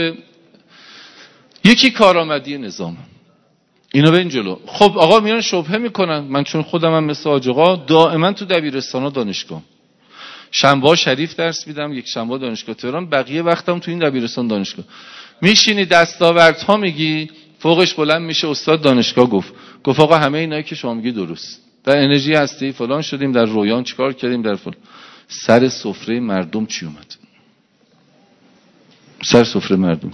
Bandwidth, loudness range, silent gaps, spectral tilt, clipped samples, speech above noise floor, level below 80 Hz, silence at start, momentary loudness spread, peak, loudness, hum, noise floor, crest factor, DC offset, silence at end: 11 kHz; 6 LU; none; -4.5 dB/octave; 0.2%; 42 dB; -56 dBFS; 0 s; 14 LU; 0 dBFS; -15 LUFS; none; -58 dBFS; 16 dB; under 0.1%; 0 s